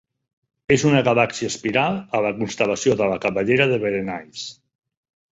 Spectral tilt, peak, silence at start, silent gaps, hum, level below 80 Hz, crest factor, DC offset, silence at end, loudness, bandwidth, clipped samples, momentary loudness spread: -5 dB/octave; -2 dBFS; 0.7 s; none; none; -54 dBFS; 20 dB; under 0.1%; 0.8 s; -20 LUFS; 8 kHz; under 0.1%; 14 LU